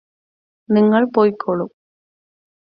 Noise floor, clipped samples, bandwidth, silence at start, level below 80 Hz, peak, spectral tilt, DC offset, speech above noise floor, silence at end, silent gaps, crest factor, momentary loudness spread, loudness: under -90 dBFS; under 0.1%; 5.2 kHz; 0.7 s; -66 dBFS; -2 dBFS; -10.5 dB/octave; under 0.1%; over 75 dB; 1 s; none; 18 dB; 10 LU; -17 LUFS